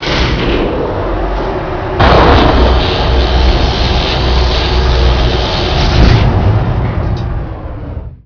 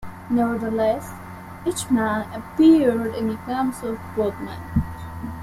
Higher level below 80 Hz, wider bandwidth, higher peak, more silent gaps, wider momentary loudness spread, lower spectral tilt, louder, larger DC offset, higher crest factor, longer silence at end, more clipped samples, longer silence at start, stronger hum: first, -14 dBFS vs -44 dBFS; second, 5.4 kHz vs 15 kHz; first, 0 dBFS vs -6 dBFS; neither; second, 10 LU vs 17 LU; about the same, -6.5 dB/octave vs -6 dB/octave; first, -11 LUFS vs -22 LUFS; neither; second, 10 dB vs 16 dB; about the same, 0.1 s vs 0 s; first, 0.8% vs under 0.1%; about the same, 0 s vs 0 s; neither